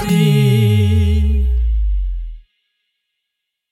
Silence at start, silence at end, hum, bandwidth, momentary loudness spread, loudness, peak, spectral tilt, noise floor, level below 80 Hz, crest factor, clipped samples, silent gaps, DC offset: 0 s; 1.3 s; none; 16.5 kHz; 13 LU; -15 LUFS; -2 dBFS; -7 dB/octave; -77 dBFS; -20 dBFS; 12 dB; under 0.1%; none; under 0.1%